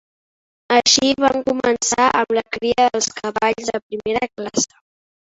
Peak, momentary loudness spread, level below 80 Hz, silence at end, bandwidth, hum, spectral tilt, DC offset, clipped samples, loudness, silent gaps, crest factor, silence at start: 0 dBFS; 9 LU; -52 dBFS; 0.65 s; 8.2 kHz; none; -1.5 dB/octave; under 0.1%; under 0.1%; -18 LUFS; 3.82-3.90 s; 18 dB; 0.7 s